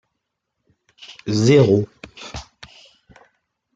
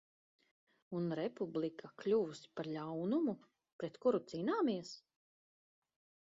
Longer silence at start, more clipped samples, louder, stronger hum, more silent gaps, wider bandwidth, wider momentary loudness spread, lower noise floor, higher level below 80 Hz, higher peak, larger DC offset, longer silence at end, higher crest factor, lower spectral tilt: about the same, 1 s vs 0.9 s; neither; first, -16 LUFS vs -39 LUFS; neither; second, none vs 3.72-3.79 s; first, 9.2 kHz vs 7.6 kHz; first, 23 LU vs 11 LU; second, -78 dBFS vs under -90 dBFS; first, -52 dBFS vs -82 dBFS; first, -2 dBFS vs -22 dBFS; neither; about the same, 1.35 s vs 1.3 s; about the same, 20 dB vs 18 dB; about the same, -6.5 dB/octave vs -6 dB/octave